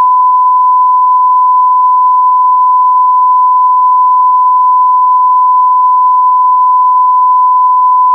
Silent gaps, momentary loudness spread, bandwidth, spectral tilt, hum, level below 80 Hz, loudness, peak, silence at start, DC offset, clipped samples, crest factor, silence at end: none; 0 LU; 1.2 kHz; -4 dB/octave; none; under -90 dBFS; -7 LUFS; -2 dBFS; 0 s; under 0.1%; under 0.1%; 4 dB; 0 s